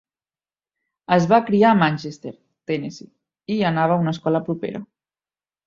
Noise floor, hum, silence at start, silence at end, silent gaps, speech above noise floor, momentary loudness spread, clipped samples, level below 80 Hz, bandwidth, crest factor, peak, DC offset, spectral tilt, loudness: under -90 dBFS; none; 1.1 s; 0.8 s; none; over 71 dB; 20 LU; under 0.1%; -62 dBFS; 7.4 kHz; 20 dB; -2 dBFS; under 0.1%; -7 dB/octave; -20 LUFS